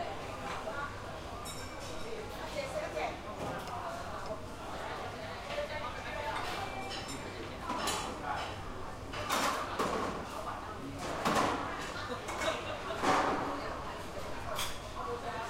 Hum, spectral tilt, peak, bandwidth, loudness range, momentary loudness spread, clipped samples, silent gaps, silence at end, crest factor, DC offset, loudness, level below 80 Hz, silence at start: none; -3.5 dB/octave; -14 dBFS; 16 kHz; 6 LU; 10 LU; under 0.1%; none; 0 s; 22 dB; under 0.1%; -37 LUFS; -52 dBFS; 0 s